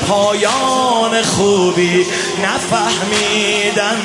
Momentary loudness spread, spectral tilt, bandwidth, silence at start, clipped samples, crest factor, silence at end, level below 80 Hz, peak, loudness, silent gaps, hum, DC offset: 3 LU; -3 dB/octave; 11.5 kHz; 0 s; under 0.1%; 12 dB; 0 s; -50 dBFS; -2 dBFS; -14 LUFS; none; none; under 0.1%